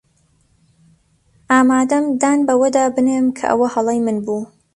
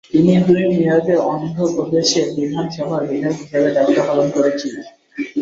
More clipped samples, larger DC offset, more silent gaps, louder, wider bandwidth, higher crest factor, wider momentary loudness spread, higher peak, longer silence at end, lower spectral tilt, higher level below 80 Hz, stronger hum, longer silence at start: neither; neither; neither; about the same, -16 LUFS vs -17 LUFS; first, 11.5 kHz vs 7.8 kHz; about the same, 16 dB vs 14 dB; second, 6 LU vs 11 LU; about the same, 0 dBFS vs -2 dBFS; first, 0.3 s vs 0 s; about the same, -4.5 dB/octave vs -5.5 dB/octave; about the same, -58 dBFS vs -56 dBFS; neither; first, 1.5 s vs 0.15 s